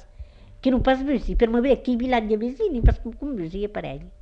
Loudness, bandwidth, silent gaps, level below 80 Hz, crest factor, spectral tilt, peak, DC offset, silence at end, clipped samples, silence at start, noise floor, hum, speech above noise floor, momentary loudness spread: -23 LUFS; 6.8 kHz; none; -28 dBFS; 20 dB; -8.5 dB/octave; -4 dBFS; under 0.1%; 0.05 s; under 0.1%; 0 s; -43 dBFS; none; 21 dB; 10 LU